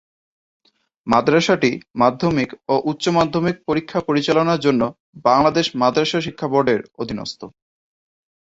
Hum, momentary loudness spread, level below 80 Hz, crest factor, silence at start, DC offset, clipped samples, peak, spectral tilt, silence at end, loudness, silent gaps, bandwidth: none; 10 LU; -54 dBFS; 18 dB; 1.05 s; under 0.1%; under 0.1%; 0 dBFS; -5.5 dB/octave; 0.95 s; -19 LUFS; 1.90-1.94 s, 5.00-5.13 s; 8 kHz